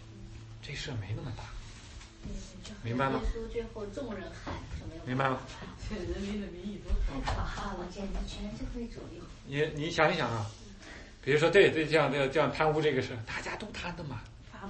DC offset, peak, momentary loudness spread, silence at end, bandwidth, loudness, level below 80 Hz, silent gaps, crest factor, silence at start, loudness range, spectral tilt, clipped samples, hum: under 0.1%; -10 dBFS; 19 LU; 0 s; 8.8 kHz; -32 LUFS; -44 dBFS; none; 22 dB; 0 s; 10 LU; -5.5 dB/octave; under 0.1%; none